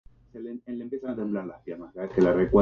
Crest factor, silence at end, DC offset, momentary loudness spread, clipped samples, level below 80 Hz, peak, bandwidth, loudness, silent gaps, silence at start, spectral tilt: 18 dB; 0 s; under 0.1%; 18 LU; under 0.1%; -48 dBFS; -8 dBFS; 7 kHz; -28 LUFS; none; 0.35 s; -9 dB/octave